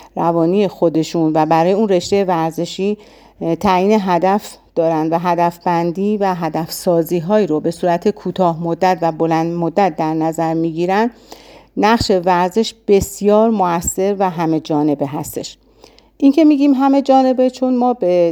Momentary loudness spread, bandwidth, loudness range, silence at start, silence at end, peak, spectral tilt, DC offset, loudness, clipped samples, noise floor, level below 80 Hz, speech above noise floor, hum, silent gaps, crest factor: 8 LU; over 20 kHz; 2 LU; 0 s; 0 s; 0 dBFS; -6 dB/octave; under 0.1%; -16 LUFS; under 0.1%; -47 dBFS; -46 dBFS; 32 dB; none; none; 14 dB